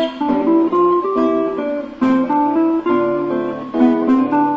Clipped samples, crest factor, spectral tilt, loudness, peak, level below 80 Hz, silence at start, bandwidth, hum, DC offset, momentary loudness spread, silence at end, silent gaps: under 0.1%; 12 dB; -8 dB/octave; -16 LUFS; -2 dBFS; -54 dBFS; 0 s; 5.8 kHz; none; under 0.1%; 6 LU; 0 s; none